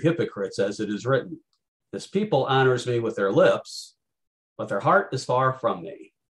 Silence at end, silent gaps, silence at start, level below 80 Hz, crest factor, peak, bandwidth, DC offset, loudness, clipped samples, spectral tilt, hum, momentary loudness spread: 0.3 s; 1.68-1.80 s, 4.27-4.56 s; 0 s; -68 dBFS; 18 dB; -6 dBFS; 12 kHz; under 0.1%; -24 LUFS; under 0.1%; -6 dB/octave; none; 17 LU